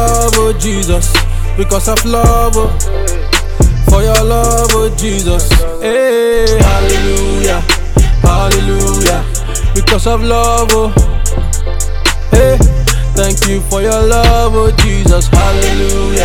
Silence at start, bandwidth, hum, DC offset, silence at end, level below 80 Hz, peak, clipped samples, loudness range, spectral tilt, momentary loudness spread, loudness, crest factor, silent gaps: 0 s; 18 kHz; none; under 0.1%; 0 s; -12 dBFS; 0 dBFS; 0.4%; 2 LU; -4.5 dB/octave; 5 LU; -11 LUFS; 8 dB; none